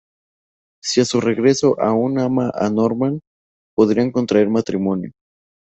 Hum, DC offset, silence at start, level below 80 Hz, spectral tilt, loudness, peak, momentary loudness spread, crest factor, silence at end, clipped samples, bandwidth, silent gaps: none; under 0.1%; 0.85 s; -56 dBFS; -5.5 dB/octave; -18 LUFS; -2 dBFS; 9 LU; 16 dB; 0.5 s; under 0.1%; 8.2 kHz; 3.27-3.77 s